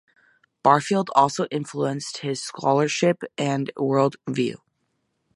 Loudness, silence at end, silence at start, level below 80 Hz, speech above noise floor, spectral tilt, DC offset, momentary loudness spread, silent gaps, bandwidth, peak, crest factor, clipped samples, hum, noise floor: -23 LUFS; 0.8 s; 0.65 s; -70 dBFS; 51 dB; -5 dB/octave; under 0.1%; 9 LU; none; 11.5 kHz; -2 dBFS; 22 dB; under 0.1%; none; -73 dBFS